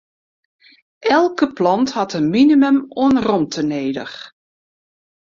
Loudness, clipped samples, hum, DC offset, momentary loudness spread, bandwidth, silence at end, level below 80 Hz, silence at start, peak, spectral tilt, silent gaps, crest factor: -16 LUFS; under 0.1%; none; under 0.1%; 12 LU; 7.4 kHz; 0.95 s; -56 dBFS; 1 s; -2 dBFS; -5.5 dB/octave; none; 16 dB